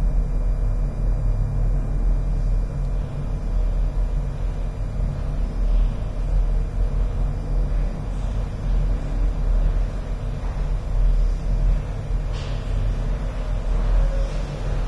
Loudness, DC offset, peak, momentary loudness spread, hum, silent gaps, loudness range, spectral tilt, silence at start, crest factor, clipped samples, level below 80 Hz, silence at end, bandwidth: -26 LUFS; under 0.1%; -10 dBFS; 5 LU; none; none; 1 LU; -7.5 dB/octave; 0 s; 12 dB; under 0.1%; -22 dBFS; 0 s; 6.2 kHz